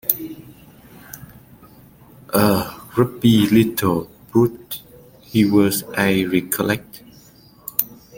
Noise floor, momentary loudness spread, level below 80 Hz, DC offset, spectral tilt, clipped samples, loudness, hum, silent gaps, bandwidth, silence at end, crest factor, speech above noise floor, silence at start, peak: -48 dBFS; 20 LU; -52 dBFS; under 0.1%; -5.5 dB/octave; under 0.1%; -19 LUFS; none; none; 17 kHz; 0 s; 20 dB; 31 dB; 0.05 s; 0 dBFS